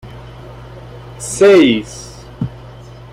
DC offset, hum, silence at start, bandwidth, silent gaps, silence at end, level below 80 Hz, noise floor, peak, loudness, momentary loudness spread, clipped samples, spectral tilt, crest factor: under 0.1%; none; 0.05 s; 13 kHz; none; 0.45 s; -42 dBFS; -35 dBFS; -2 dBFS; -13 LUFS; 26 LU; under 0.1%; -5 dB/octave; 14 dB